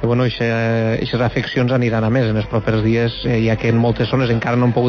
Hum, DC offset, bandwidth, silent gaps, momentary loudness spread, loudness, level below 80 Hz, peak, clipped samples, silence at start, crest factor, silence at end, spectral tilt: none; under 0.1%; 6.8 kHz; none; 2 LU; -17 LUFS; -38 dBFS; -4 dBFS; under 0.1%; 0 s; 12 dB; 0 s; -8 dB/octave